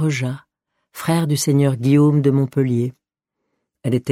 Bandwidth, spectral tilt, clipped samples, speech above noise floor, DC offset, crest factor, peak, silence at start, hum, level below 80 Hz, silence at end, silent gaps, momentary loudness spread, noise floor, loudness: 15.5 kHz; -6.5 dB/octave; under 0.1%; 62 dB; under 0.1%; 16 dB; -4 dBFS; 0 s; none; -58 dBFS; 0 s; none; 13 LU; -79 dBFS; -18 LUFS